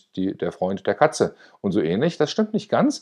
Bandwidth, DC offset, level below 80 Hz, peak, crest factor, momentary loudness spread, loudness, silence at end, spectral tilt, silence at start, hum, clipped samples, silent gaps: 12 kHz; under 0.1%; -64 dBFS; -2 dBFS; 20 dB; 6 LU; -23 LUFS; 0.05 s; -5.5 dB/octave; 0.15 s; none; under 0.1%; none